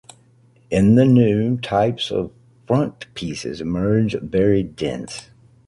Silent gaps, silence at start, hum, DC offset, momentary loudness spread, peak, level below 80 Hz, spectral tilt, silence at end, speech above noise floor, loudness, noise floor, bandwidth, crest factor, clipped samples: none; 0.7 s; none; under 0.1%; 15 LU; -2 dBFS; -44 dBFS; -7 dB/octave; 0.45 s; 35 dB; -19 LUFS; -54 dBFS; 11.5 kHz; 16 dB; under 0.1%